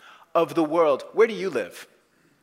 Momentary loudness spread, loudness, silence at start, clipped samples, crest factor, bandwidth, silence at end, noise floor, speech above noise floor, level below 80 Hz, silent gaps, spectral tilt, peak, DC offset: 11 LU; -23 LUFS; 0.35 s; under 0.1%; 18 dB; 16 kHz; 0.6 s; -62 dBFS; 39 dB; -80 dBFS; none; -5.5 dB/octave; -8 dBFS; under 0.1%